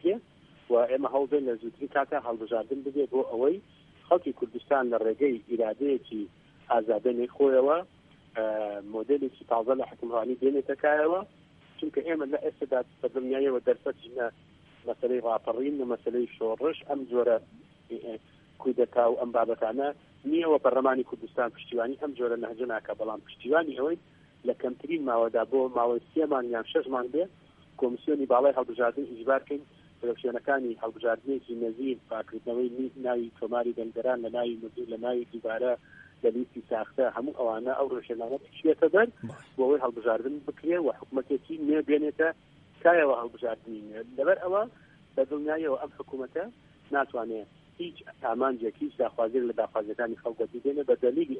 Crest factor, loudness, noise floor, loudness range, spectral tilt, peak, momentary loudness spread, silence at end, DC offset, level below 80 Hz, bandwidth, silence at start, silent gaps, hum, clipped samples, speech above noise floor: 22 dB; -29 LUFS; -57 dBFS; 4 LU; -7.5 dB/octave; -8 dBFS; 11 LU; 0 s; under 0.1%; -72 dBFS; 4.1 kHz; 0.05 s; none; none; under 0.1%; 28 dB